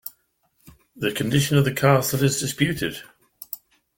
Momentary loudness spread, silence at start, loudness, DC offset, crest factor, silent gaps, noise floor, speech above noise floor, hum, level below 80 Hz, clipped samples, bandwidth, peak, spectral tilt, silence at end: 18 LU; 0.05 s; -21 LUFS; under 0.1%; 20 dB; none; -67 dBFS; 46 dB; none; -54 dBFS; under 0.1%; 17 kHz; -2 dBFS; -5 dB/octave; 0.4 s